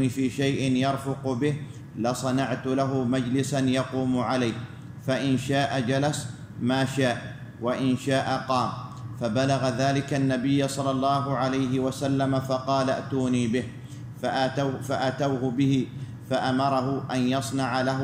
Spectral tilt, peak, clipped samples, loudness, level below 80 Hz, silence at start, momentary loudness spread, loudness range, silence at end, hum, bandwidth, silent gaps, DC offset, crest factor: -6 dB/octave; -12 dBFS; under 0.1%; -26 LUFS; -58 dBFS; 0 s; 8 LU; 2 LU; 0 s; none; 15.5 kHz; none; under 0.1%; 14 dB